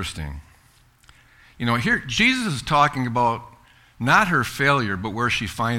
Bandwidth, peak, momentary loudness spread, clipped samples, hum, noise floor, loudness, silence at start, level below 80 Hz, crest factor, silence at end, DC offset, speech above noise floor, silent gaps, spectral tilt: 16.5 kHz; -4 dBFS; 12 LU; under 0.1%; none; -56 dBFS; -21 LUFS; 0 s; -44 dBFS; 20 dB; 0 s; under 0.1%; 34 dB; none; -4.5 dB/octave